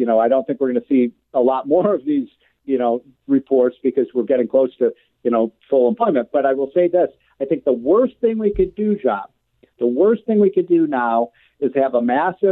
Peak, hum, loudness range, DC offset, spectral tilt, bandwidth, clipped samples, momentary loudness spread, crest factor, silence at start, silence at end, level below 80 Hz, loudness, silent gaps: -4 dBFS; none; 1 LU; under 0.1%; -11 dB/octave; 4 kHz; under 0.1%; 7 LU; 14 dB; 0 s; 0 s; -50 dBFS; -18 LUFS; none